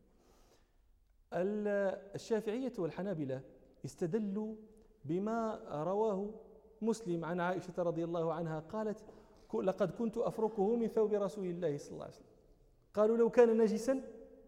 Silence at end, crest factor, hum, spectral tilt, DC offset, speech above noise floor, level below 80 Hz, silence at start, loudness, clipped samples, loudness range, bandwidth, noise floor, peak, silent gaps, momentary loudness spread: 0.05 s; 20 dB; none; -7 dB/octave; under 0.1%; 34 dB; -68 dBFS; 1.3 s; -36 LUFS; under 0.1%; 6 LU; 12.5 kHz; -69 dBFS; -16 dBFS; none; 14 LU